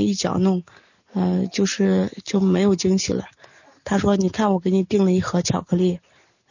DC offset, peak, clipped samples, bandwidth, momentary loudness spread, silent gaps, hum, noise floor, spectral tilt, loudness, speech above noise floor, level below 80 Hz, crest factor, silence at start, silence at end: under 0.1%; -6 dBFS; under 0.1%; 7.4 kHz; 7 LU; none; none; -51 dBFS; -6 dB/octave; -21 LUFS; 31 dB; -48 dBFS; 14 dB; 0 s; 0.55 s